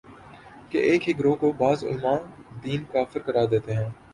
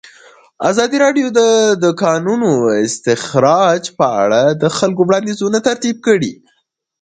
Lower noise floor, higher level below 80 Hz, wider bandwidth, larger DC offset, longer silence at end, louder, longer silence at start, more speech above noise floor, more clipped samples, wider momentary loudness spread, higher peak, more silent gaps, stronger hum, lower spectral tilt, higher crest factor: second, -47 dBFS vs -64 dBFS; about the same, -56 dBFS vs -58 dBFS; first, 11 kHz vs 9.4 kHz; neither; second, 0.2 s vs 0.7 s; second, -25 LUFS vs -14 LUFS; second, 0.1 s vs 0.6 s; second, 23 dB vs 51 dB; neither; first, 9 LU vs 5 LU; second, -8 dBFS vs 0 dBFS; neither; neither; first, -7.5 dB/octave vs -4.5 dB/octave; about the same, 16 dB vs 14 dB